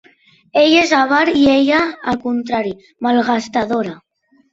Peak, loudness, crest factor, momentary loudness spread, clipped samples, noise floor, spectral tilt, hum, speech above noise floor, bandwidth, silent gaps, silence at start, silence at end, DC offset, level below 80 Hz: -2 dBFS; -15 LUFS; 14 dB; 10 LU; under 0.1%; -51 dBFS; -4 dB/octave; none; 36 dB; 7.8 kHz; none; 0.55 s; 0.6 s; under 0.1%; -52 dBFS